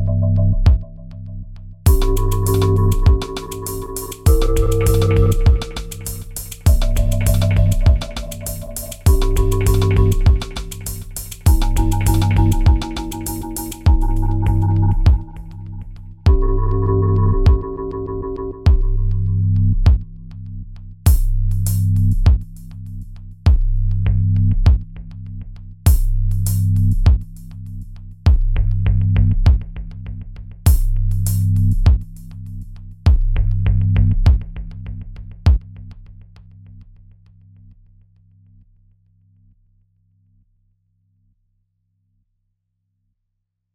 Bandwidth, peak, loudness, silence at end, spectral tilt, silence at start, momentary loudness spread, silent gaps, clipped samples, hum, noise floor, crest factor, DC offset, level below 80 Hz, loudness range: 16.5 kHz; -2 dBFS; -18 LUFS; 6.9 s; -6.5 dB/octave; 0 s; 18 LU; none; under 0.1%; none; -75 dBFS; 16 dB; under 0.1%; -20 dBFS; 2 LU